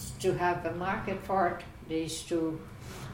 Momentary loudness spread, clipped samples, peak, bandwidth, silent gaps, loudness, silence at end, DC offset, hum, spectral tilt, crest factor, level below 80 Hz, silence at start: 12 LU; under 0.1%; -16 dBFS; 16.5 kHz; none; -32 LUFS; 0 s; under 0.1%; none; -5 dB/octave; 18 dB; -52 dBFS; 0 s